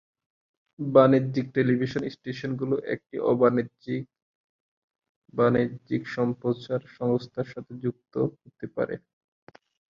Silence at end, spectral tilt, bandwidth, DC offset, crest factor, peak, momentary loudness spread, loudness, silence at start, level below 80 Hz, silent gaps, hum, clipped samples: 0.95 s; -8.5 dB/octave; 7 kHz; under 0.1%; 22 dB; -4 dBFS; 13 LU; -27 LUFS; 0.8 s; -64 dBFS; 4.22-4.88 s, 5.09-5.22 s; none; under 0.1%